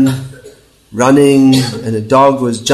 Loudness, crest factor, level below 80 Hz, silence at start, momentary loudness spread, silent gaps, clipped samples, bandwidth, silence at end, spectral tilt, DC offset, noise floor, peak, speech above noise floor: -10 LUFS; 10 dB; -48 dBFS; 0 s; 15 LU; none; 0.3%; 13 kHz; 0 s; -5.5 dB/octave; under 0.1%; -40 dBFS; 0 dBFS; 30 dB